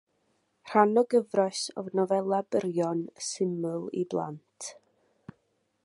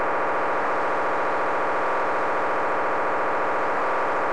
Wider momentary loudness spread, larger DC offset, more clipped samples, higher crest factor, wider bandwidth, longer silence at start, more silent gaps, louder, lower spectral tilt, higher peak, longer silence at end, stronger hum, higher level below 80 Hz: first, 15 LU vs 0 LU; second, under 0.1% vs 3%; neither; first, 24 dB vs 8 dB; about the same, 11.5 kHz vs 11 kHz; first, 0.65 s vs 0 s; neither; second, -28 LUFS vs -24 LUFS; about the same, -5 dB/octave vs -5 dB/octave; first, -6 dBFS vs -16 dBFS; first, 1.1 s vs 0 s; neither; second, -78 dBFS vs -66 dBFS